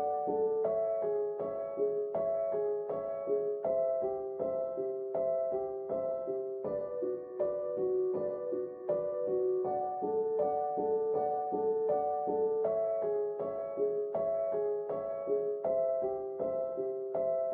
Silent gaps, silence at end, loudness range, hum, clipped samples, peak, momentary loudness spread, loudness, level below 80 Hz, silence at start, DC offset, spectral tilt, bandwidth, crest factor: none; 0 s; 3 LU; none; under 0.1%; -20 dBFS; 5 LU; -34 LUFS; -72 dBFS; 0 s; under 0.1%; -9 dB/octave; 2.4 kHz; 12 dB